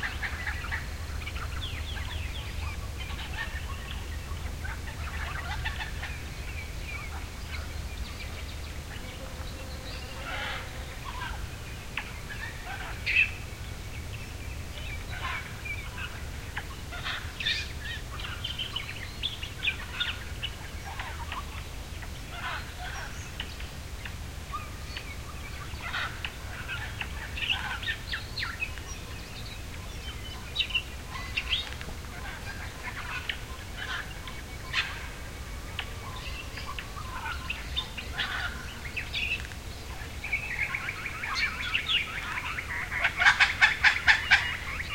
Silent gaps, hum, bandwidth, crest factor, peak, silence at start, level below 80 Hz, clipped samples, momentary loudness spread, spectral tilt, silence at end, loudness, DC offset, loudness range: none; none; 16.5 kHz; 28 dB; -6 dBFS; 0 s; -42 dBFS; under 0.1%; 12 LU; -3 dB/octave; 0 s; -32 LUFS; 0.2%; 7 LU